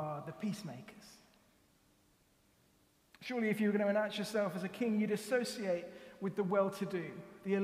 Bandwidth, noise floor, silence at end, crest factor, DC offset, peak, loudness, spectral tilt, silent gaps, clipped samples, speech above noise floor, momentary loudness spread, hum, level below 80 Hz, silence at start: 15.5 kHz; -71 dBFS; 0 s; 18 dB; under 0.1%; -20 dBFS; -37 LUFS; -6 dB/octave; none; under 0.1%; 35 dB; 15 LU; none; -78 dBFS; 0 s